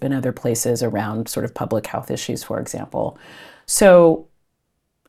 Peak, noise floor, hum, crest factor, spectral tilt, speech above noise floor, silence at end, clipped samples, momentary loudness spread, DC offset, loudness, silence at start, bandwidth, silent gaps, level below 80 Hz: 0 dBFS; -72 dBFS; none; 20 dB; -5 dB/octave; 54 dB; 0.85 s; under 0.1%; 15 LU; under 0.1%; -19 LUFS; 0 s; 15 kHz; none; -50 dBFS